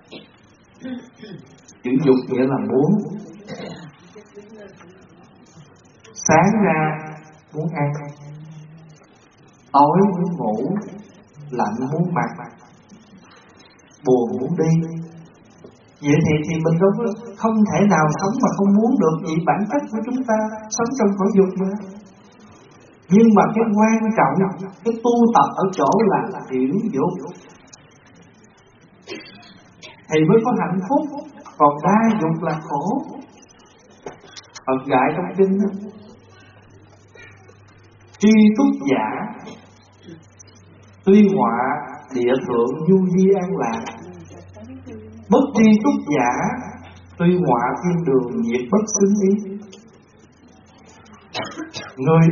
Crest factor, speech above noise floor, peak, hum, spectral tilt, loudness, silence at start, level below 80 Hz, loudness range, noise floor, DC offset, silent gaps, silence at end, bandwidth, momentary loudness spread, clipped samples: 18 dB; 34 dB; 0 dBFS; none; -7 dB/octave; -18 LUFS; 0.1 s; -60 dBFS; 6 LU; -51 dBFS; under 0.1%; none; 0 s; 7.2 kHz; 22 LU; under 0.1%